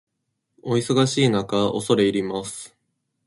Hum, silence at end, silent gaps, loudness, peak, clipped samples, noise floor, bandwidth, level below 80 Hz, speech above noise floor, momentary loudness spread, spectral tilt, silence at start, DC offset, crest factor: none; 0.6 s; none; -21 LUFS; -6 dBFS; under 0.1%; -77 dBFS; 11.5 kHz; -58 dBFS; 56 dB; 17 LU; -5 dB/octave; 0.65 s; under 0.1%; 18 dB